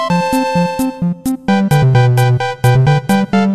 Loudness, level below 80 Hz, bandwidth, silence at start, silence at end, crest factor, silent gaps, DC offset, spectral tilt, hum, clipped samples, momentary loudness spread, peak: -13 LUFS; -40 dBFS; 15 kHz; 0 s; 0 s; 12 dB; none; under 0.1%; -7 dB/octave; none; under 0.1%; 7 LU; 0 dBFS